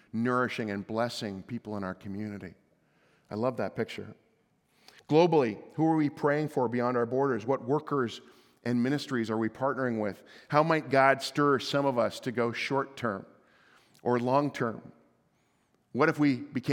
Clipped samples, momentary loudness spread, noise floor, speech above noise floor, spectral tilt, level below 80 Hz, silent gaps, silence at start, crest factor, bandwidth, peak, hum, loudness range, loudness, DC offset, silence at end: under 0.1%; 13 LU; -71 dBFS; 42 dB; -6.5 dB/octave; -76 dBFS; none; 0.15 s; 22 dB; 17 kHz; -8 dBFS; none; 8 LU; -29 LUFS; under 0.1%; 0 s